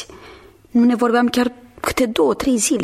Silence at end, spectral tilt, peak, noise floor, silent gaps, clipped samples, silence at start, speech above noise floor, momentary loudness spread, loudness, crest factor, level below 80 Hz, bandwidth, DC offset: 0 s; -3.5 dB/octave; -4 dBFS; -43 dBFS; none; under 0.1%; 0 s; 27 dB; 8 LU; -18 LUFS; 14 dB; -46 dBFS; 15 kHz; under 0.1%